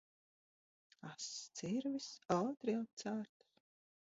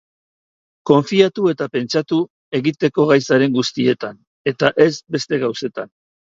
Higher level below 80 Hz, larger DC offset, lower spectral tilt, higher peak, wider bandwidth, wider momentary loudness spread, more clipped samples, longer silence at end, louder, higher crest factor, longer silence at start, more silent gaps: second, -82 dBFS vs -62 dBFS; neither; about the same, -5 dB/octave vs -5.5 dB/octave; second, -22 dBFS vs 0 dBFS; about the same, 7.6 kHz vs 7.8 kHz; about the same, 13 LU vs 11 LU; neither; first, 0.8 s vs 0.45 s; second, -42 LUFS vs -18 LUFS; about the same, 22 dB vs 18 dB; first, 1.05 s vs 0.85 s; second, 2.93-2.97 s vs 2.30-2.52 s, 4.27-4.45 s